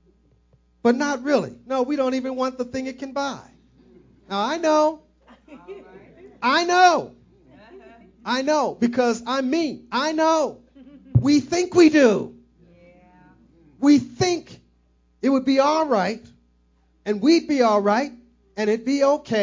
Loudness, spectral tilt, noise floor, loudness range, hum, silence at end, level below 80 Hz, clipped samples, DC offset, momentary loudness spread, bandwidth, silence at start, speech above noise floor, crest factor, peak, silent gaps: -21 LUFS; -5 dB/octave; -61 dBFS; 6 LU; none; 0 s; -52 dBFS; under 0.1%; under 0.1%; 13 LU; 7.6 kHz; 0.85 s; 41 dB; 18 dB; -4 dBFS; none